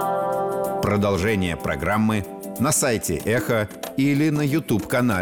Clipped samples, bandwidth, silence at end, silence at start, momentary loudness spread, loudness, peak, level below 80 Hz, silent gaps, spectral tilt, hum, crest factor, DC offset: under 0.1%; 19.5 kHz; 0 s; 0 s; 5 LU; -22 LUFS; -10 dBFS; -46 dBFS; none; -5 dB/octave; none; 12 dB; 0.1%